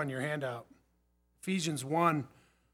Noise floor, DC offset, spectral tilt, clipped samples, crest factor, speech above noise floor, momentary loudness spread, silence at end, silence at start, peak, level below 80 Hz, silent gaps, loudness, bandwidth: -73 dBFS; under 0.1%; -5 dB/octave; under 0.1%; 22 dB; 40 dB; 15 LU; 0.45 s; 0 s; -14 dBFS; -76 dBFS; none; -34 LUFS; 17.5 kHz